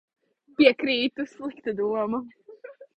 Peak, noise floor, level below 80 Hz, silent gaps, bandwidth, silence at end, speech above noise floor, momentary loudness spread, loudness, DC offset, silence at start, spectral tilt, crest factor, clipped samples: -4 dBFS; -46 dBFS; -68 dBFS; none; 8.4 kHz; 0.15 s; 22 dB; 18 LU; -25 LUFS; under 0.1%; 0.6 s; -5.5 dB/octave; 22 dB; under 0.1%